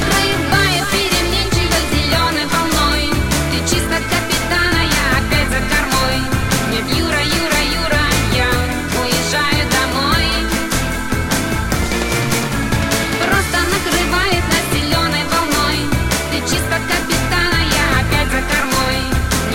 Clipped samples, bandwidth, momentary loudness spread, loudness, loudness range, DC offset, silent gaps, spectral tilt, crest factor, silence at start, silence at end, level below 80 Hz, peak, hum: under 0.1%; 17 kHz; 3 LU; -15 LUFS; 1 LU; under 0.1%; none; -3.5 dB/octave; 14 dB; 0 s; 0 s; -24 dBFS; 0 dBFS; none